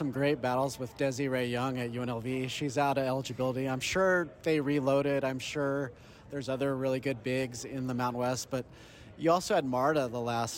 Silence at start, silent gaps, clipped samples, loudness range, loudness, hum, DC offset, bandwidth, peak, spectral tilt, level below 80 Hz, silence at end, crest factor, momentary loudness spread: 0 s; none; under 0.1%; 3 LU; -31 LUFS; none; under 0.1%; 17 kHz; -14 dBFS; -5.5 dB/octave; -62 dBFS; 0 s; 16 dB; 8 LU